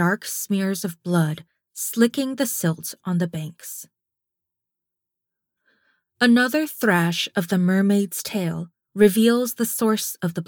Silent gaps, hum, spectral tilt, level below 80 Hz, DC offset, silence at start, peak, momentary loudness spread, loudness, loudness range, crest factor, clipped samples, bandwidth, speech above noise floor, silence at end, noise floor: none; none; -5 dB/octave; -68 dBFS; under 0.1%; 0 s; -4 dBFS; 14 LU; -21 LUFS; 9 LU; 20 dB; under 0.1%; over 20 kHz; 63 dB; 0.05 s; -84 dBFS